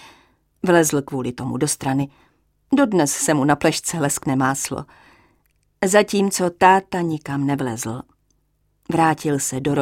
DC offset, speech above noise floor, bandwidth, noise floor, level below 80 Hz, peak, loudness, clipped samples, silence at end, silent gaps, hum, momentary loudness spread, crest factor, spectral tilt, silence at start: under 0.1%; 46 dB; 17 kHz; -66 dBFS; -54 dBFS; -2 dBFS; -20 LUFS; under 0.1%; 0 s; none; none; 10 LU; 20 dB; -4.5 dB/octave; 0 s